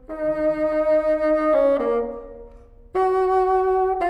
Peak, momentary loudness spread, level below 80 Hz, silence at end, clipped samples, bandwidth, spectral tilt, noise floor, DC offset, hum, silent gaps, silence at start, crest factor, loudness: -10 dBFS; 9 LU; -46 dBFS; 0 s; under 0.1%; 9.4 kHz; -7 dB/octave; -45 dBFS; under 0.1%; none; none; 0.1 s; 12 dB; -21 LUFS